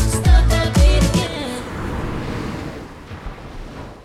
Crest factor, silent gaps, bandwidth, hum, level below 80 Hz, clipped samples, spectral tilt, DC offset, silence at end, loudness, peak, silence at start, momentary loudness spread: 16 dB; none; 14 kHz; none; -20 dBFS; under 0.1%; -5.5 dB/octave; under 0.1%; 0 s; -19 LUFS; -2 dBFS; 0 s; 20 LU